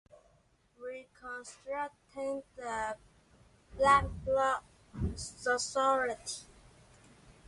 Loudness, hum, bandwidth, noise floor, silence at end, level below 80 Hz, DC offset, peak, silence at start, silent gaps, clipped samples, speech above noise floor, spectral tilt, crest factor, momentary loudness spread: -33 LUFS; none; 11.5 kHz; -69 dBFS; 0.15 s; -52 dBFS; under 0.1%; -12 dBFS; 0.8 s; none; under 0.1%; 36 dB; -3.5 dB/octave; 22 dB; 18 LU